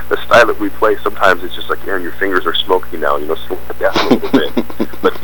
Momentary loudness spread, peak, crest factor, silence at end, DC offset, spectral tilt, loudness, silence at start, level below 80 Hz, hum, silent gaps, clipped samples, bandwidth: 11 LU; 0 dBFS; 16 dB; 0 s; 20%; -4.5 dB/octave; -15 LUFS; 0 s; -38 dBFS; 60 Hz at -35 dBFS; none; under 0.1%; 19.5 kHz